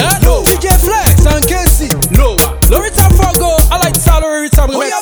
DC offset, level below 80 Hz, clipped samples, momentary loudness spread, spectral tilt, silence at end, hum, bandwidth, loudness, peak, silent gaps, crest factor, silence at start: under 0.1%; -12 dBFS; 1%; 3 LU; -4.5 dB/octave; 0 s; none; over 20 kHz; -10 LUFS; 0 dBFS; none; 8 dB; 0 s